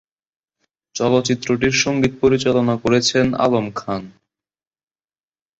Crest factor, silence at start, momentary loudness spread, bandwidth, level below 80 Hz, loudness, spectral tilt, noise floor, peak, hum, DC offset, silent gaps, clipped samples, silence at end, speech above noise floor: 18 dB; 0.95 s; 10 LU; 8.2 kHz; -48 dBFS; -18 LUFS; -4.5 dB/octave; under -90 dBFS; -2 dBFS; none; under 0.1%; none; under 0.1%; 1.5 s; over 73 dB